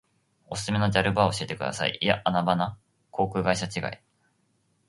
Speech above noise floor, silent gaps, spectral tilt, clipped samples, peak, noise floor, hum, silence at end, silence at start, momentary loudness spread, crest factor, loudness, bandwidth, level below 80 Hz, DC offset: 44 dB; none; -5 dB/octave; under 0.1%; -4 dBFS; -70 dBFS; none; 0.9 s; 0.5 s; 11 LU; 24 dB; -26 LUFS; 11.5 kHz; -52 dBFS; under 0.1%